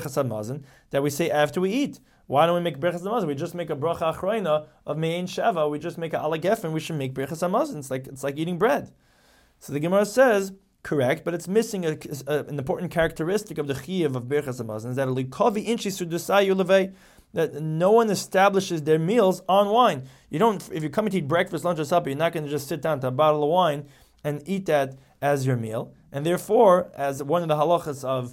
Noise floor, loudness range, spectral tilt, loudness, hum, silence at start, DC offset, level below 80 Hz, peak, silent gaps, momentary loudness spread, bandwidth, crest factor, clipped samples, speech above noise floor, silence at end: -59 dBFS; 5 LU; -5.5 dB/octave; -24 LUFS; none; 0 s; under 0.1%; -58 dBFS; -6 dBFS; none; 11 LU; 17 kHz; 18 dB; under 0.1%; 35 dB; 0 s